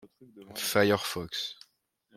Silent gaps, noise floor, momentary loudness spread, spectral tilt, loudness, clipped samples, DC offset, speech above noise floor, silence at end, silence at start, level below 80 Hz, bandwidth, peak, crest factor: none; -71 dBFS; 16 LU; -3.5 dB/octave; -29 LUFS; under 0.1%; under 0.1%; 42 dB; 0.65 s; 0.05 s; -68 dBFS; 16.5 kHz; -10 dBFS; 22 dB